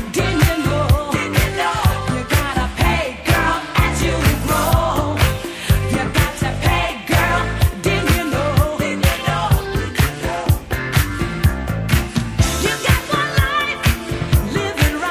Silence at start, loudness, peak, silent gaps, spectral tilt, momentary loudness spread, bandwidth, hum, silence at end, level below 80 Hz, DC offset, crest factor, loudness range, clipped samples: 0 s; -18 LUFS; -2 dBFS; none; -5 dB/octave; 3 LU; 16 kHz; none; 0 s; -24 dBFS; under 0.1%; 16 dB; 1 LU; under 0.1%